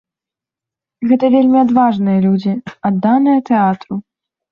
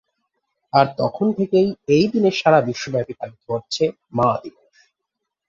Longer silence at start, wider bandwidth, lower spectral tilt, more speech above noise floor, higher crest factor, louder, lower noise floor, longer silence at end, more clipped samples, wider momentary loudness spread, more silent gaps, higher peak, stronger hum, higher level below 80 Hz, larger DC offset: first, 1 s vs 0.75 s; second, 5.6 kHz vs 7.8 kHz; first, -9.5 dB/octave vs -6 dB/octave; first, 74 dB vs 62 dB; about the same, 14 dB vs 18 dB; first, -13 LUFS vs -19 LUFS; first, -87 dBFS vs -80 dBFS; second, 0.5 s vs 1 s; neither; about the same, 12 LU vs 11 LU; neither; about the same, -2 dBFS vs -2 dBFS; neither; about the same, -58 dBFS vs -58 dBFS; neither